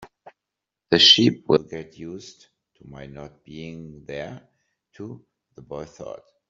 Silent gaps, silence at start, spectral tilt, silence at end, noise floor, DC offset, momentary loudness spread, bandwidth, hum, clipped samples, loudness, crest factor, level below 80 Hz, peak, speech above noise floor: none; 0 s; -2.5 dB/octave; 0.35 s; -86 dBFS; under 0.1%; 28 LU; 7.6 kHz; none; under 0.1%; -16 LUFS; 24 dB; -60 dBFS; -2 dBFS; 62 dB